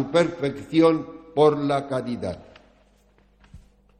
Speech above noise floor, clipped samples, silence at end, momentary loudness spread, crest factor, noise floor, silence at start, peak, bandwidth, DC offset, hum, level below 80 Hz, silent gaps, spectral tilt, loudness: 37 dB; under 0.1%; 0.4 s; 12 LU; 18 dB; -59 dBFS; 0 s; -6 dBFS; 9.6 kHz; under 0.1%; 50 Hz at -55 dBFS; -56 dBFS; none; -7 dB/octave; -23 LUFS